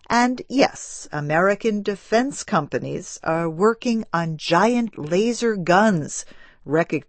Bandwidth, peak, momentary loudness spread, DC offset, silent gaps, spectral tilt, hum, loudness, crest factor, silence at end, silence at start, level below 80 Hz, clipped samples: 8.8 kHz; -4 dBFS; 10 LU; under 0.1%; none; -5 dB/octave; none; -21 LUFS; 18 dB; 0.05 s; 0.1 s; -54 dBFS; under 0.1%